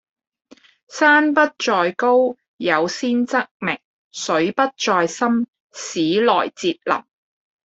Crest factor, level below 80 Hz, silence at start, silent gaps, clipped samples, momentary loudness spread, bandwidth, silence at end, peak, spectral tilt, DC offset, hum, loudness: 18 dB; -66 dBFS; 0.9 s; 2.48-2.57 s, 3.51-3.60 s, 3.84-4.11 s, 5.48-5.53 s, 5.60-5.70 s; under 0.1%; 12 LU; 8.2 kHz; 0.65 s; -2 dBFS; -3.5 dB/octave; under 0.1%; none; -19 LUFS